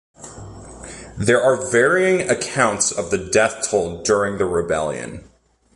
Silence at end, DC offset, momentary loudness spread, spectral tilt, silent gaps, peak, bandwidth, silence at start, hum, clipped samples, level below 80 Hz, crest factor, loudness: 0.55 s; under 0.1%; 21 LU; -3.5 dB/octave; none; -2 dBFS; 11.5 kHz; 0.2 s; none; under 0.1%; -46 dBFS; 18 dB; -18 LUFS